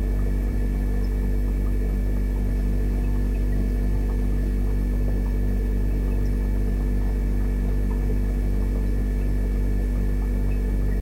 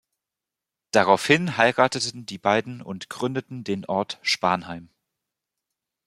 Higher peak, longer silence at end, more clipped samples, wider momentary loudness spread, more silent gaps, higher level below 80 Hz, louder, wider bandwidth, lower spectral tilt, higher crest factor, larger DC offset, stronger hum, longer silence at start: second, -14 dBFS vs -2 dBFS; second, 0 s vs 1.2 s; neither; second, 1 LU vs 16 LU; neither; first, -22 dBFS vs -66 dBFS; second, -26 LUFS vs -23 LUFS; second, 13.5 kHz vs 15.5 kHz; first, -8.5 dB/octave vs -4 dB/octave; second, 8 dB vs 24 dB; neither; first, 50 Hz at -40 dBFS vs none; second, 0 s vs 0.95 s